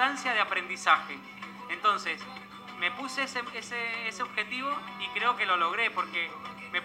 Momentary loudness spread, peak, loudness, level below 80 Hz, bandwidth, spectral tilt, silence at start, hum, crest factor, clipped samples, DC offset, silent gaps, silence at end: 15 LU; -8 dBFS; -29 LUFS; -74 dBFS; 16 kHz; -2 dB/octave; 0 s; none; 22 dB; under 0.1%; under 0.1%; none; 0 s